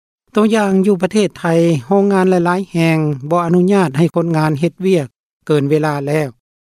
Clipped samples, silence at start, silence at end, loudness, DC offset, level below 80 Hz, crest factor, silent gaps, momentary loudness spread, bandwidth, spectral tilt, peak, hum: under 0.1%; 0.35 s; 0.4 s; -15 LUFS; under 0.1%; -58 dBFS; 12 dB; 5.20-5.40 s; 5 LU; 14.5 kHz; -7 dB/octave; -2 dBFS; none